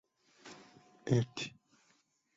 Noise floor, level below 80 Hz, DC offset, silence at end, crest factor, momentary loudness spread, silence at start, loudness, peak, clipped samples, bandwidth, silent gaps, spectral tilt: -74 dBFS; -70 dBFS; under 0.1%; 0.85 s; 22 dB; 23 LU; 0.45 s; -36 LUFS; -18 dBFS; under 0.1%; 7.8 kHz; none; -6.5 dB/octave